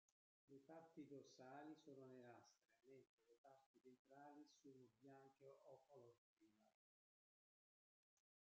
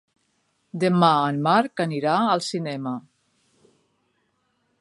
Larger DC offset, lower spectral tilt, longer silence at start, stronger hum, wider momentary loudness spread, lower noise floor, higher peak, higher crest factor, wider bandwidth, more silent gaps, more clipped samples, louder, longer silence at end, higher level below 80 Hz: neither; about the same, -5 dB/octave vs -6 dB/octave; second, 0.45 s vs 0.75 s; neither; second, 7 LU vs 13 LU; first, under -90 dBFS vs -70 dBFS; second, -50 dBFS vs -4 dBFS; about the same, 18 dB vs 22 dB; second, 7.4 kHz vs 11.5 kHz; first, 3.09-3.18 s, 3.38-3.44 s, 3.66-3.74 s, 3.99-4.05 s, 6.18-6.37 s vs none; neither; second, -66 LUFS vs -22 LUFS; about the same, 1.85 s vs 1.8 s; second, under -90 dBFS vs -74 dBFS